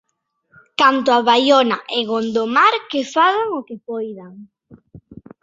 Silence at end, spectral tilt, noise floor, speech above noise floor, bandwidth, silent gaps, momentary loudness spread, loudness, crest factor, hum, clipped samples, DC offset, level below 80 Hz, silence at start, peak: 0.3 s; -3.5 dB/octave; -70 dBFS; 53 dB; 7.8 kHz; none; 15 LU; -16 LUFS; 18 dB; none; under 0.1%; under 0.1%; -62 dBFS; 0.8 s; -2 dBFS